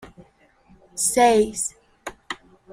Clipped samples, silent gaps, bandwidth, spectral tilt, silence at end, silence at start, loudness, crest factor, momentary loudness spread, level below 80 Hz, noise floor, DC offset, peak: under 0.1%; none; 16 kHz; -2.5 dB/octave; 0.4 s; 0 s; -20 LUFS; 20 dB; 22 LU; -54 dBFS; -57 dBFS; under 0.1%; -4 dBFS